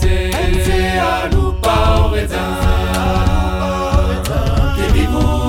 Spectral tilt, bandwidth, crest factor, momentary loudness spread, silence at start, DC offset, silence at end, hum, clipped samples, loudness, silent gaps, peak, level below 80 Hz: -6 dB/octave; 17 kHz; 12 dB; 3 LU; 0 s; under 0.1%; 0 s; none; under 0.1%; -16 LUFS; none; -2 dBFS; -16 dBFS